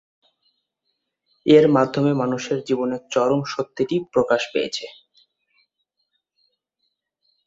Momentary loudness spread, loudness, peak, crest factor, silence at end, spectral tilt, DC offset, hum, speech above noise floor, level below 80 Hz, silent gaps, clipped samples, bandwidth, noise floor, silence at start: 13 LU; -20 LUFS; -2 dBFS; 22 dB; 2.55 s; -6 dB/octave; under 0.1%; none; 57 dB; -64 dBFS; none; under 0.1%; 7.8 kHz; -76 dBFS; 1.45 s